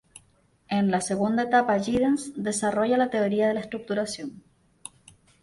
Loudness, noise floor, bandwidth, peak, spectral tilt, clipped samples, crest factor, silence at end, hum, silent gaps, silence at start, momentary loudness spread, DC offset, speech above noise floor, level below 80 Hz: -25 LUFS; -63 dBFS; 11.5 kHz; -10 dBFS; -5 dB/octave; under 0.1%; 16 dB; 1.05 s; none; none; 0.15 s; 17 LU; under 0.1%; 38 dB; -60 dBFS